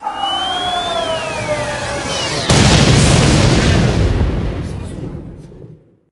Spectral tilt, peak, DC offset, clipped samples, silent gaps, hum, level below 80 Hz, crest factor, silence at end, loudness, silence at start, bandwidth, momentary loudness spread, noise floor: -4.5 dB/octave; 0 dBFS; under 0.1%; under 0.1%; none; none; -24 dBFS; 16 dB; 0.4 s; -14 LUFS; 0 s; 12 kHz; 16 LU; -40 dBFS